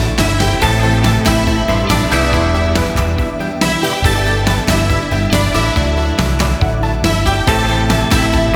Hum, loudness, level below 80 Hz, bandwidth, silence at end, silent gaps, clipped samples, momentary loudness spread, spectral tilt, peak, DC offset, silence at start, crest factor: none; -14 LUFS; -20 dBFS; over 20 kHz; 0 s; none; under 0.1%; 3 LU; -5 dB/octave; 0 dBFS; under 0.1%; 0 s; 12 dB